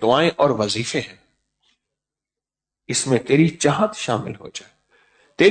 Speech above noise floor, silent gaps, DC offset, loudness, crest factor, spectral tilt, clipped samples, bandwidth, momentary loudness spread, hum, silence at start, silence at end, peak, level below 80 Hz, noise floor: 69 dB; none; under 0.1%; -20 LUFS; 18 dB; -4.5 dB/octave; under 0.1%; 9.4 kHz; 17 LU; none; 0 s; 0 s; -4 dBFS; -58 dBFS; -89 dBFS